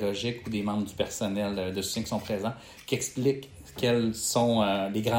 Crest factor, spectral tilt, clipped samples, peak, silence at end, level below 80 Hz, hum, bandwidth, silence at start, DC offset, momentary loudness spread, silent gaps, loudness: 16 dB; -4.5 dB/octave; under 0.1%; -12 dBFS; 0 s; -58 dBFS; none; 16.5 kHz; 0 s; under 0.1%; 8 LU; none; -29 LUFS